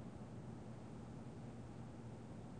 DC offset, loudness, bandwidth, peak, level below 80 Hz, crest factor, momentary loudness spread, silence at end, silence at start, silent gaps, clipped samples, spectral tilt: under 0.1%; -54 LUFS; 9.6 kHz; -40 dBFS; -66 dBFS; 12 dB; 1 LU; 0 s; 0 s; none; under 0.1%; -7.5 dB/octave